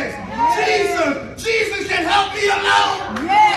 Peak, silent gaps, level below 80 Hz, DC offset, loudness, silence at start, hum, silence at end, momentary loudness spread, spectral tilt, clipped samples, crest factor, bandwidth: -2 dBFS; none; -46 dBFS; under 0.1%; -17 LUFS; 0 s; none; 0 s; 7 LU; -2.5 dB/octave; under 0.1%; 16 dB; 14 kHz